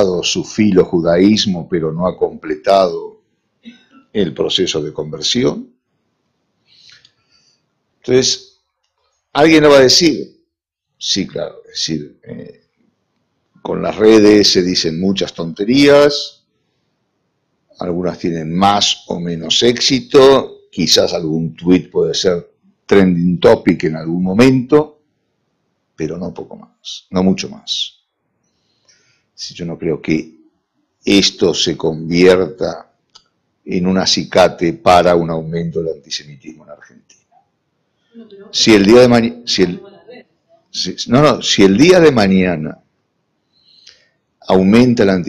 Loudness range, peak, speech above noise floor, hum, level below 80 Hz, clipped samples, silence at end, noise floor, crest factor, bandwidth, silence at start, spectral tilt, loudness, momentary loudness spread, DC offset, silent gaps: 9 LU; 0 dBFS; 62 dB; none; -46 dBFS; under 0.1%; 0 s; -75 dBFS; 14 dB; 15 kHz; 0 s; -4.5 dB/octave; -13 LUFS; 17 LU; under 0.1%; none